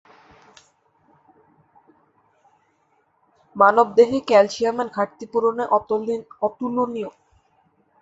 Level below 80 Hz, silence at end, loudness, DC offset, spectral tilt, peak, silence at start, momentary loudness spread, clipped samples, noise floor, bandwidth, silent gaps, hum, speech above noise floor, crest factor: -66 dBFS; 0.9 s; -20 LUFS; under 0.1%; -5 dB/octave; -2 dBFS; 3.55 s; 12 LU; under 0.1%; -65 dBFS; 8 kHz; none; none; 45 dB; 20 dB